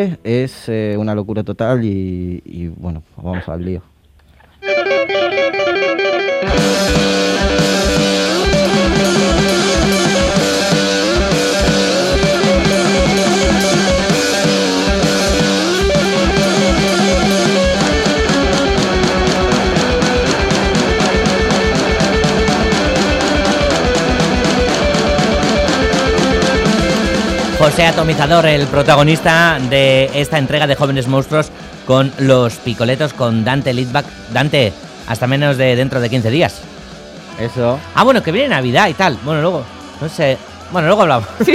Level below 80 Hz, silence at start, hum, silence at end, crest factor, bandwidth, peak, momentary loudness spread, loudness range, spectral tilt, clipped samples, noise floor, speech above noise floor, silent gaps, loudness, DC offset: -28 dBFS; 0 s; none; 0 s; 14 dB; 15.5 kHz; 0 dBFS; 9 LU; 5 LU; -4.5 dB/octave; under 0.1%; -47 dBFS; 34 dB; none; -13 LUFS; under 0.1%